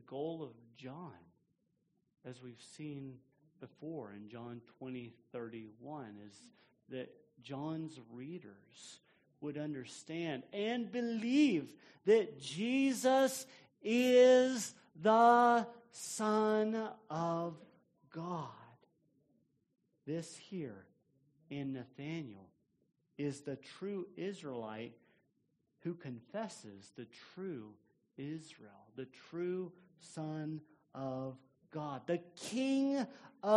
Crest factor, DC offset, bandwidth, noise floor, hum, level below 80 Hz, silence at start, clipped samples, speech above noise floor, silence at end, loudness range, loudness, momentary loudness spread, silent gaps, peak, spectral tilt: 22 dB; under 0.1%; 11.5 kHz; -80 dBFS; none; -86 dBFS; 0.1 s; under 0.1%; 43 dB; 0 s; 19 LU; -36 LUFS; 22 LU; none; -16 dBFS; -5 dB/octave